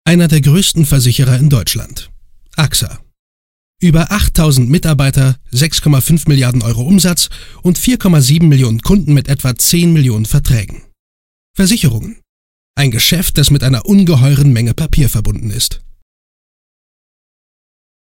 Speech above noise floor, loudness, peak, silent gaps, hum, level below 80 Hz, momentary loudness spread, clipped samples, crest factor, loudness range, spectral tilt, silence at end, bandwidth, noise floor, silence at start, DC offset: over 80 dB; -11 LUFS; 0 dBFS; 3.19-3.74 s, 10.99-11.54 s, 12.29-12.74 s; none; -24 dBFS; 8 LU; under 0.1%; 12 dB; 4 LU; -5 dB/octave; 2.35 s; 16.5 kHz; under -90 dBFS; 0.05 s; under 0.1%